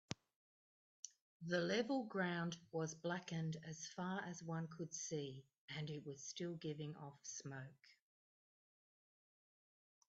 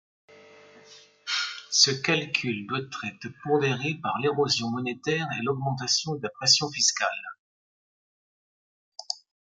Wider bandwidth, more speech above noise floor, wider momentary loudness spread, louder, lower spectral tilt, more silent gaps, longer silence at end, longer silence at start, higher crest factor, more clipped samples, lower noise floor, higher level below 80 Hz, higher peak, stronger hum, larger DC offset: second, 8 kHz vs 12 kHz; first, over 44 dB vs 26 dB; about the same, 14 LU vs 15 LU; second, -46 LUFS vs -25 LUFS; first, -5 dB/octave vs -2.5 dB/octave; second, 0.36-1.03 s, 1.21-1.40 s, 5.58-5.68 s vs 7.39-8.92 s; first, 2.15 s vs 0.4 s; second, 0.1 s vs 0.3 s; about the same, 26 dB vs 24 dB; neither; first, under -90 dBFS vs -53 dBFS; second, -86 dBFS vs -72 dBFS; second, -22 dBFS vs -4 dBFS; neither; neither